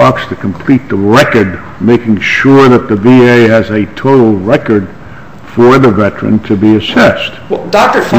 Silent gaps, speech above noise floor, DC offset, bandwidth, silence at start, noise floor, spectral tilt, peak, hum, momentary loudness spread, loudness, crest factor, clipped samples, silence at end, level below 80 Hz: none; 22 dB; 2%; 16 kHz; 0 s; -29 dBFS; -6.5 dB/octave; 0 dBFS; none; 10 LU; -8 LUFS; 8 dB; 3%; 0 s; -38 dBFS